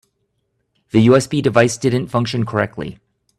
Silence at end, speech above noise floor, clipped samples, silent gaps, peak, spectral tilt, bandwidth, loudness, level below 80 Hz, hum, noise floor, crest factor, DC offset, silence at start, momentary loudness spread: 0.45 s; 54 dB; under 0.1%; none; 0 dBFS; -6 dB/octave; 13 kHz; -16 LUFS; -52 dBFS; none; -69 dBFS; 18 dB; under 0.1%; 0.95 s; 11 LU